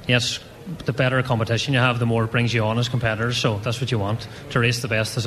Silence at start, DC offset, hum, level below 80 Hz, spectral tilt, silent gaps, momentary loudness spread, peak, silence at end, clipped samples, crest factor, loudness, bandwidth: 0 s; under 0.1%; none; -48 dBFS; -5 dB/octave; none; 8 LU; -2 dBFS; 0 s; under 0.1%; 18 dB; -22 LUFS; 13.5 kHz